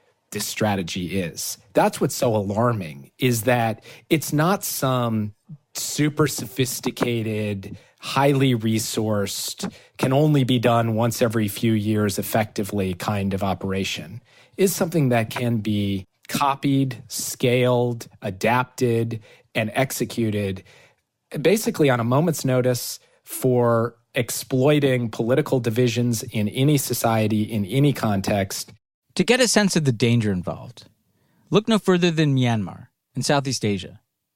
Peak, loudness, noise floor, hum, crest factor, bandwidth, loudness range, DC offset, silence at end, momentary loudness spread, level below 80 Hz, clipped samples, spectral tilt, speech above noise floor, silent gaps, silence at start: -2 dBFS; -22 LUFS; -64 dBFS; none; 20 dB; 16.5 kHz; 3 LU; under 0.1%; 0.4 s; 11 LU; -60 dBFS; under 0.1%; -5 dB/octave; 43 dB; 28.94-29.02 s; 0.3 s